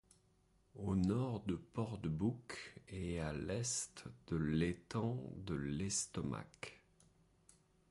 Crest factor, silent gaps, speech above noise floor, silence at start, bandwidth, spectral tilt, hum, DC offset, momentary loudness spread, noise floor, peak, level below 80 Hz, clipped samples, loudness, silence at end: 18 dB; none; 33 dB; 0.75 s; 11.5 kHz; -5 dB/octave; none; under 0.1%; 12 LU; -74 dBFS; -24 dBFS; -58 dBFS; under 0.1%; -41 LUFS; 1.15 s